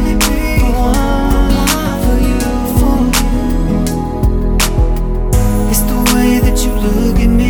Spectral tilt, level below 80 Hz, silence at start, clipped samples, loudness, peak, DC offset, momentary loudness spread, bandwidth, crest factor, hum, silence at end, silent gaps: -5 dB/octave; -14 dBFS; 0 s; under 0.1%; -13 LUFS; 0 dBFS; under 0.1%; 4 LU; 19.5 kHz; 12 dB; none; 0 s; none